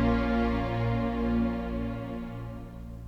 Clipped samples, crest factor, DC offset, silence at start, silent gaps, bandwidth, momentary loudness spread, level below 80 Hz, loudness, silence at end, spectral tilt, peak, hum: under 0.1%; 14 dB; under 0.1%; 0 s; none; 6.4 kHz; 13 LU; -38 dBFS; -30 LUFS; 0 s; -8.5 dB/octave; -14 dBFS; none